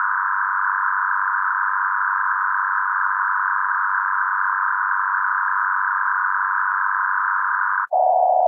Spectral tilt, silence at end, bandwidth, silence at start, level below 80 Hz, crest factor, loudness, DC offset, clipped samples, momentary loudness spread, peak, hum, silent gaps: -2.5 dB/octave; 0 s; 2.5 kHz; 0 s; under -90 dBFS; 14 dB; -20 LUFS; under 0.1%; under 0.1%; 0 LU; -6 dBFS; none; none